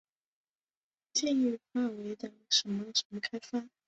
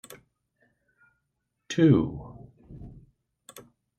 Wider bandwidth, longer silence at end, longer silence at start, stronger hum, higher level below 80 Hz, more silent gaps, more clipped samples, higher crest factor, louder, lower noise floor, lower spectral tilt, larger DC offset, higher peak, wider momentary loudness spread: second, 8.2 kHz vs 14 kHz; second, 0.2 s vs 1.1 s; second, 1.15 s vs 1.7 s; neither; second, -80 dBFS vs -56 dBFS; first, 3.05-3.10 s vs none; neither; about the same, 22 dB vs 24 dB; second, -32 LUFS vs -24 LUFS; first, under -90 dBFS vs -80 dBFS; second, -2.5 dB/octave vs -7 dB/octave; neither; second, -14 dBFS vs -8 dBFS; second, 11 LU vs 28 LU